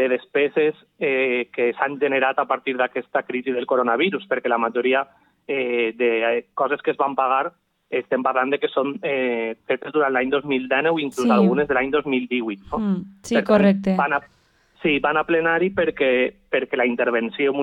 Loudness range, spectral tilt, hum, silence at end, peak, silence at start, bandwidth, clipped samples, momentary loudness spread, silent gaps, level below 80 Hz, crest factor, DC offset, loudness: 2 LU; -6 dB/octave; none; 0 s; -4 dBFS; 0 s; 11.5 kHz; under 0.1%; 7 LU; none; -56 dBFS; 18 dB; under 0.1%; -21 LUFS